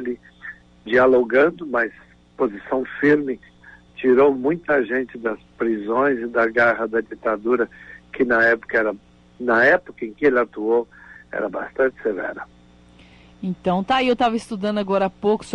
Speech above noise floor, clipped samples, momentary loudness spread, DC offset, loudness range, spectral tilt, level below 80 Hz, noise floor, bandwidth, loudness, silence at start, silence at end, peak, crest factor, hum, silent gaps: 29 dB; under 0.1%; 16 LU; under 0.1%; 4 LU; -6.5 dB/octave; -54 dBFS; -49 dBFS; 11 kHz; -20 LUFS; 0 s; 0 s; -6 dBFS; 16 dB; 60 Hz at -55 dBFS; none